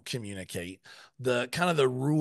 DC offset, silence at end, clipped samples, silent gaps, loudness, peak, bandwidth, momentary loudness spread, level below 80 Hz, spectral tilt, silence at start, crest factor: under 0.1%; 0 s; under 0.1%; none; -30 LUFS; -12 dBFS; 12.5 kHz; 14 LU; -68 dBFS; -5.5 dB/octave; 0.05 s; 18 dB